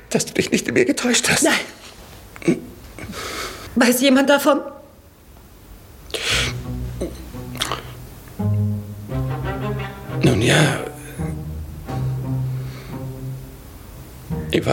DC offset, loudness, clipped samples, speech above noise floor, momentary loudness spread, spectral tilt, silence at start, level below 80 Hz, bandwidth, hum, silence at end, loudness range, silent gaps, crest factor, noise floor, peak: under 0.1%; -21 LUFS; under 0.1%; 28 dB; 22 LU; -4.5 dB/octave; 0 s; -40 dBFS; 17 kHz; none; 0 s; 7 LU; none; 20 dB; -46 dBFS; -2 dBFS